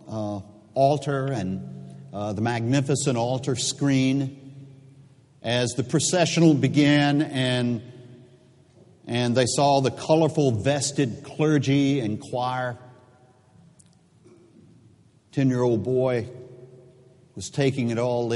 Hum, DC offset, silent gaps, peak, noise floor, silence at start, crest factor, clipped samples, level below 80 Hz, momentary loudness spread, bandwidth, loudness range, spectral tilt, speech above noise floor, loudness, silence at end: none; under 0.1%; none; -6 dBFS; -56 dBFS; 0.05 s; 18 dB; under 0.1%; -62 dBFS; 14 LU; 11.5 kHz; 6 LU; -5.5 dB/octave; 34 dB; -23 LUFS; 0 s